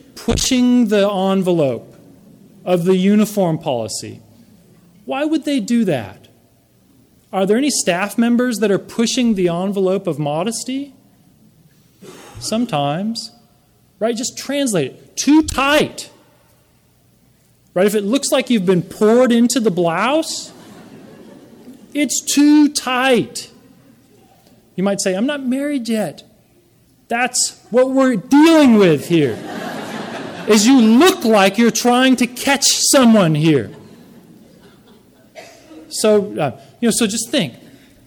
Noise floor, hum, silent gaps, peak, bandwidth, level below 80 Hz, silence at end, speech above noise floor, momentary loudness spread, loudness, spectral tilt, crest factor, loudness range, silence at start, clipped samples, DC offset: -55 dBFS; none; none; -2 dBFS; 19.5 kHz; -46 dBFS; 0.5 s; 40 dB; 15 LU; -16 LUFS; -4 dB/octave; 14 dB; 9 LU; 0.15 s; under 0.1%; under 0.1%